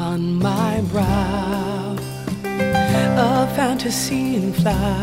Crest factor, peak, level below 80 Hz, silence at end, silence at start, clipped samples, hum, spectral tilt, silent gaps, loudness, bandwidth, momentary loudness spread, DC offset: 14 dB; -4 dBFS; -36 dBFS; 0 s; 0 s; under 0.1%; none; -5.5 dB/octave; none; -20 LUFS; 16 kHz; 8 LU; under 0.1%